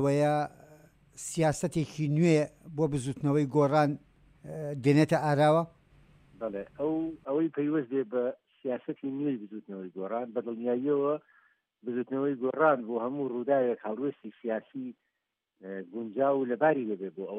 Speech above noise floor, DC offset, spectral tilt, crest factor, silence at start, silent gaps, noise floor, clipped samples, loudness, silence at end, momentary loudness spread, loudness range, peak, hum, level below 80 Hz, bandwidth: 55 dB; under 0.1%; -7 dB/octave; 18 dB; 0 s; none; -84 dBFS; under 0.1%; -30 LUFS; 0 s; 15 LU; 6 LU; -12 dBFS; none; -64 dBFS; 14 kHz